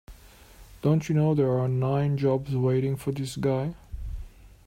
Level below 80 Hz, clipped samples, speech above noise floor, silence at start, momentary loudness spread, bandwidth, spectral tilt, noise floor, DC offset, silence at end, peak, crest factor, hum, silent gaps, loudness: -46 dBFS; under 0.1%; 26 dB; 0.1 s; 16 LU; 15.5 kHz; -8 dB/octave; -50 dBFS; under 0.1%; 0.2 s; -12 dBFS; 14 dB; none; none; -26 LUFS